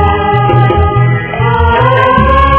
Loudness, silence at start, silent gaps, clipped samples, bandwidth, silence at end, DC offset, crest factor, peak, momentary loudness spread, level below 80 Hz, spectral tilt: -9 LUFS; 0 s; none; 1%; 4 kHz; 0 s; under 0.1%; 8 dB; 0 dBFS; 4 LU; -18 dBFS; -10.5 dB/octave